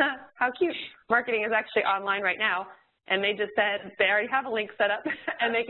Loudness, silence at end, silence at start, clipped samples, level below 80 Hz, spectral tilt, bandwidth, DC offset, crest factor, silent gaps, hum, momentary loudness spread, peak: -26 LUFS; 0 s; 0 s; under 0.1%; -70 dBFS; -7.5 dB/octave; 4.3 kHz; under 0.1%; 20 dB; none; none; 6 LU; -8 dBFS